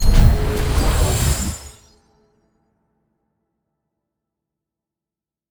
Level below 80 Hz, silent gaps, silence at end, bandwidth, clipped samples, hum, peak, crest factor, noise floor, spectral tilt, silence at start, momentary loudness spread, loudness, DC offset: -22 dBFS; none; 3.85 s; over 20 kHz; under 0.1%; none; 0 dBFS; 20 dB; -88 dBFS; -5 dB/octave; 0 s; 14 LU; -19 LUFS; under 0.1%